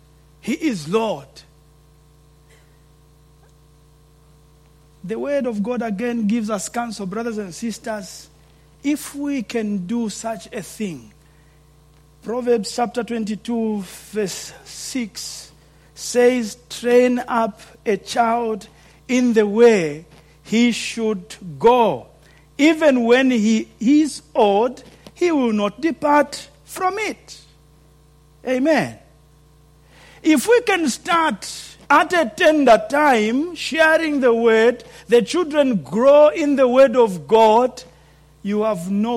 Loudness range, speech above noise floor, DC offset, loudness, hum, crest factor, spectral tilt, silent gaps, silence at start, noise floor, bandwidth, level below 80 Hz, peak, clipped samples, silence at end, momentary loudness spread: 11 LU; 33 dB; under 0.1%; -18 LUFS; none; 16 dB; -4.5 dB/octave; none; 0.45 s; -51 dBFS; 16 kHz; -54 dBFS; -4 dBFS; under 0.1%; 0 s; 16 LU